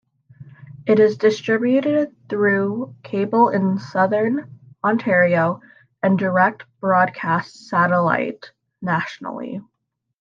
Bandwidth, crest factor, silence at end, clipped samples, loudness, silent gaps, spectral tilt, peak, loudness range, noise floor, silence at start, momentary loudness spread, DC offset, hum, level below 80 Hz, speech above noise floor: 7.4 kHz; 16 dB; 0.6 s; under 0.1%; -19 LUFS; none; -7.5 dB/octave; -4 dBFS; 2 LU; -77 dBFS; 0.4 s; 13 LU; under 0.1%; none; -70 dBFS; 58 dB